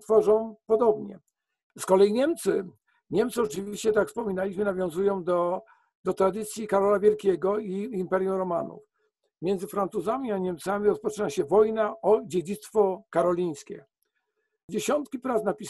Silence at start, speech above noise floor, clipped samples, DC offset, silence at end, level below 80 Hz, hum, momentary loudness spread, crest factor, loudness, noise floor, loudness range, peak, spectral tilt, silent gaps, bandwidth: 0.1 s; 52 dB; under 0.1%; under 0.1%; 0 s; -64 dBFS; none; 10 LU; 18 dB; -26 LUFS; -78 dBFS; 3 LU; -8 dBFS; -6 dB/octave; 1.63-1.70 s, 5.95-6.04 s, 14.63-14.68 s; 12.5 kHz